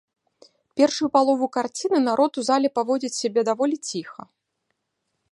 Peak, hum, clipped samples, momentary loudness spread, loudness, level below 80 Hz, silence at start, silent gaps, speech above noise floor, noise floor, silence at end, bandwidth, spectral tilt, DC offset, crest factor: -4 dBFS; none; under 0.1%; 10 LU; -22 LUFS; -76 dBFS; 0.75 s; none; 55 dB; -77 dBFS; 1.2 s; 11.5 kHz; -3.5 dB/octave; under 0.1%; 20 dB